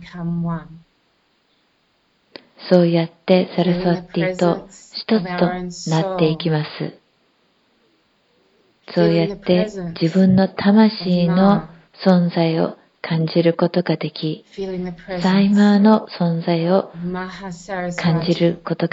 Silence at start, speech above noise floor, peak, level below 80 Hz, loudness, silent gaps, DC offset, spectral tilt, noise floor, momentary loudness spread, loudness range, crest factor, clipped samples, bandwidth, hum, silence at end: 0 s; 45 dB; 0 dBFS; -52 dBFS; -18 LUFS; none; under 0.1%; -7.5 dB/octave; -63 dBFS; 13 LU; 6 LU; 18 dB; under 0.1%; 7.8 kHz; none; 0.05 s